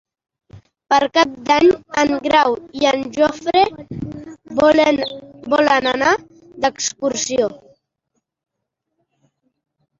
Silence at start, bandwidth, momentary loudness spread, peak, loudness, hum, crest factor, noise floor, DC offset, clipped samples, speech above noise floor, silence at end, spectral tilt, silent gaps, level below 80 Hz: 0.55 s; 7.8 kHz; 12 LU; -2 dBFS; -17 LUFS; none; 18 dB; -78 dBFS; under 0.1%; under 0.1%; 62 dB; 2.45 s; -3 dB/octave; none; -52 dBFS